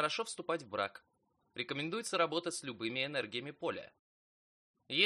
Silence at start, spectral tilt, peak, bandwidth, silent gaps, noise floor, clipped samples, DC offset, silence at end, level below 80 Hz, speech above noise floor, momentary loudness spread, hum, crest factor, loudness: 0 s; -3 dB/octave; -14 dBFS; 11.5 kHz; 3.99-4.74 s; under -90 dBFS; under 0.1%; under 0.1%; 0 s; -82 dBFS; over 52 dB; 8 LU; none; 24 dB; -38 LUFS